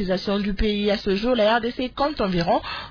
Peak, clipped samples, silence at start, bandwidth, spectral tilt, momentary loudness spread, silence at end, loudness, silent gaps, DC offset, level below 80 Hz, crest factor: -8 dBFS; under 0.1%; 0 s; 5.4 kHz; -6.5 dB/octave; 5 LU; 0 s; -22 LUFS; none; under 0.1%; -36 dBFS; 14 dB